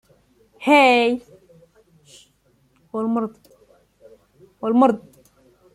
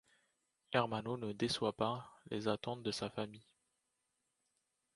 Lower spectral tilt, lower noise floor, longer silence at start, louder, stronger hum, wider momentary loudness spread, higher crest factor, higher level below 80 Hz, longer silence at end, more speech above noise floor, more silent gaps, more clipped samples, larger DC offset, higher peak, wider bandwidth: about the same, -4.5 dB/octave vs -5 dB/octave; second, -61 dBFS vs -85 dBFS; about the same, 0.6 s vs 0.7 s; first, -19 LUFS vs -40 LUFS; neither; first, 17 LU vs 9 LU; second, 20 dB vs 26 dB; first, -66 dBFS vs -72 dBFS; second, 0.75 s vs 1.55 s; about the same, 44 dB vs 46 dB; neither; neither; neither; first, -2 dBFS vs -16 dBFS; about the same, 12.5 kHz vs 11.5 kHz